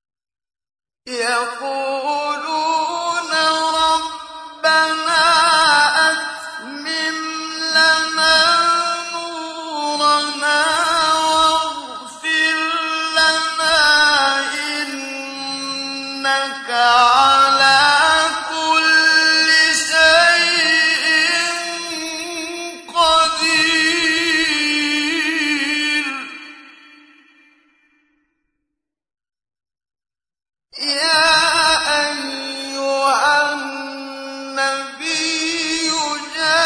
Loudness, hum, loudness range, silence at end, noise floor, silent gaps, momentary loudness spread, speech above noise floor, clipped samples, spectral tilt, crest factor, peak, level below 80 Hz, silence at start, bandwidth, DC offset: -15 LUFS; none; 7 LU; 0 s; -80 dBFS; none; 14 LU; 59 dB; under 0.1%; 0 dB/octave; 16 dB; -2 dBFS; -54 dBFS; 1.05 s; 11 kHz; under 0.1%